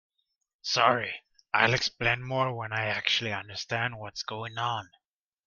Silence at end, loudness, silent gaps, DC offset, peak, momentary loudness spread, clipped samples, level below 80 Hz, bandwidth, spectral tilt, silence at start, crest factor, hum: 0.6 s; -28 LUFS; none; under 0.1%; -6 dBFS; 12 LU; under 0.1%; -60 dBFS; 7.4 kHz; -3.5 dB/octave; 0.65 s; 26 dB; none